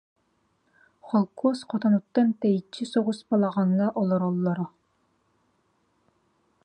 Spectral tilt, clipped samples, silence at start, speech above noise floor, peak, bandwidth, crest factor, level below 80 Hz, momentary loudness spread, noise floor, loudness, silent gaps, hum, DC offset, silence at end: -8 dB/octave; under 0.1%; 1.05 s; 46 dB; -10 dBFS; 9.8 kHz; 18 dB; -74 dBFS; 5 LU; -70 dBFS; -25 LUFS; none; none; under 0.1%; 2 s